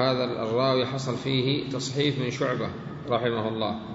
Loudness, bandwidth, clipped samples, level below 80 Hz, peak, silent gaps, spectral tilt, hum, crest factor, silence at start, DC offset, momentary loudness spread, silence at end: -27 LUFS; 8 kHz; under 0.1%; -58 dBFS; -10 dBFS; none; -5.5 dB/octave; none; 16 dB; 0 s; under 0.1%; 6 LU; 0 s